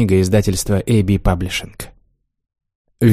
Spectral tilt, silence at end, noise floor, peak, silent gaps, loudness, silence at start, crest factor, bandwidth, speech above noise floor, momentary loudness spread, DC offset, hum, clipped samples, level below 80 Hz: -6 dB/octave; 0 s; -60 dBFS; -2 dBFS; 2.75-2.85 s; -17 LUFS; 0 s; 16 dB; 15.5 kHz; 44 dB; 19 LU; under 0.1%; none; under 0.1%; -30 dBFS